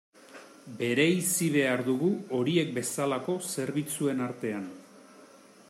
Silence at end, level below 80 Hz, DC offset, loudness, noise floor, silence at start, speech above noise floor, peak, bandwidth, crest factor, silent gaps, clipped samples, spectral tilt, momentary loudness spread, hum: 0.35 s; -76 dBFS; under 0.1%; -29 LUFS; -54 dBFS; 0.3 s; 26 dB; -12 dBFS; 16 kHz; 16 dB; none; under 0.1%; -4.5 dB/octave; 12 LU; none